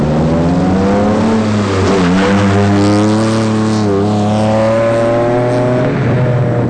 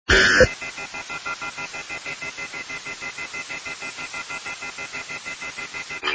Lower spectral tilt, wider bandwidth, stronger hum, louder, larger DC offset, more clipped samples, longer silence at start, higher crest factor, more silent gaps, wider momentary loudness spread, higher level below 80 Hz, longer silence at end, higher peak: first, -7 dB/octave vs -2.5 dB/octave; first, 10 kHz vs 8 kHz; neither; first, -12 LUFS vs -25 LUFS; neither; neither; about the same, 0 s vs 0.1 s; second, 6 dB vs 24 dB; neither; second, 2 LU vs 14 LU; first, -34 dBFS vs -40 dBFS; about the same, 0 s vs 0 s; second, -6 dBFS vs -2 dBFS